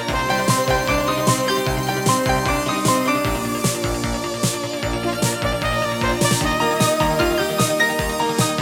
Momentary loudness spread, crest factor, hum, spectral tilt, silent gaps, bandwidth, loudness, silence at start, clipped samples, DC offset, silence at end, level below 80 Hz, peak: 4 LU; 16 dB; none; -4 dB/octave; none; 18.5 kHz; -19 LUFS; 0 s; under 0.1%; under 0.1%; 0 s; -34 dBFS; -4 dBFS